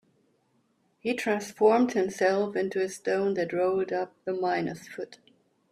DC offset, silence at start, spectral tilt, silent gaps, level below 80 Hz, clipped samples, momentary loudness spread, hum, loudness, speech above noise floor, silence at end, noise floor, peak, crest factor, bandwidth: under 0.1%; 1.05 s; -5 dB/octave; none; -72 dBFS; under 0.1%; 12 LU; none; -27 LUFS; 43 dB; 0.55 s; -70 dBFS; -10 dBFS; 18 dB; 14 kHz